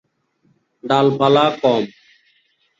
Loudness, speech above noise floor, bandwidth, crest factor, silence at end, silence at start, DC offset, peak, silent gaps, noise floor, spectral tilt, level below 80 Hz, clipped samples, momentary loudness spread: -16 LUFS; 47 dB; 7.8 kHz; 18 dB; 0.9 s; 0.85 s; under 0.1%; -2 dBFS; none; -62 dBFS; -6.5 dB/octave; -62 dBFS; under 0.1%; 13 LU